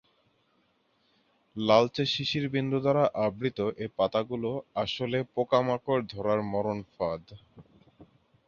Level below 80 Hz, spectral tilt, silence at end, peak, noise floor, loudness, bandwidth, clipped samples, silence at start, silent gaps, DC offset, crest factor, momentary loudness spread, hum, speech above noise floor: -62 dBFS; -6.5 dB/octave; 0.45 s; -8 dBFS; -70 dBFS; -29 LUFS; 7.2 kHz; under 0.1%; 1.55 s; none; under 0.1%; 22 dB; 9 LU; none; 42 dB